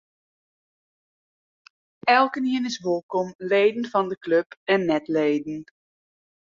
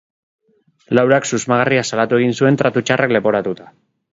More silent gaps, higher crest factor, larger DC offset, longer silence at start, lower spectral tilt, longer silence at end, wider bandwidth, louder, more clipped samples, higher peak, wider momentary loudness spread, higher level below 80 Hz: first, 3.03-3.09 s, 3.35-3.39 s, 4.17-4.21 s, 4.46-4.50 s, 4.57-4.66 s vs none; about the same, 20 dB vs 16 dB; neither; first, 2.05 s vs 0.9 s; about the same, -5 dB/octave vs -5 dB/octave; first, 0.85 s vs 0.45 s; about the same, 7.6 kHz vs 8 kHz; second, -23 LUFS vs -16 LUFS; neither; second, -4 dBFS vs 0 dBFS; first, 8 LU vs 5 LU; second, -72 dBFS vs -58 dBFS